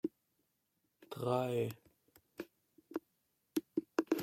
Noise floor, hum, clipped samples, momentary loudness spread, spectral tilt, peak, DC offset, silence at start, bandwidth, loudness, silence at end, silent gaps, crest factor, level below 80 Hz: -82 dBFS; none; under 0.1%; 17 LU; -6.5 dB/octave; -18 dBFS; under 0.1%; 0.05 s; 16.5 kHz; -40 LUFS; 0 s; none; 24 dB; -82 dBFS